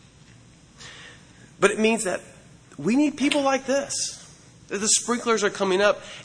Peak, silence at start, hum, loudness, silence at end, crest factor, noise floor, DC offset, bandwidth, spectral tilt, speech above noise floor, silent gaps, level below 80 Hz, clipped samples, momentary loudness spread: -2 dBFS; 0.8 s; none; -23 LUFS; 0 s; 24 dB; -51 dBFS; under 0.1%; 11 kHz; -2.5 dB/octave; 28 dB; none; -60 dBFS; under 0.1%; 21 LU